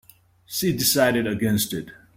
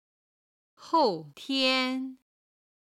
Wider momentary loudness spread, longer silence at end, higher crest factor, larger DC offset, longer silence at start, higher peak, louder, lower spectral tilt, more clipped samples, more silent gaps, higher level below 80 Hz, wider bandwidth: about the same, 11 LU vs 13 LU; second, 0.25 s vs 0.8 s; about the same, 18 dB vs 18 dB; neither; second, 0.5 s vs 0.8 s; first, -6 dBFS vs -12 dBFS; first, -22 LUFS vs -27 LUFS; about the same, -4 dB/octave vs -3.5 dB/octave; neither; neither; first, -54 dBFS vs -78 dBFS; first, 16.5 kHz vs 14 kHz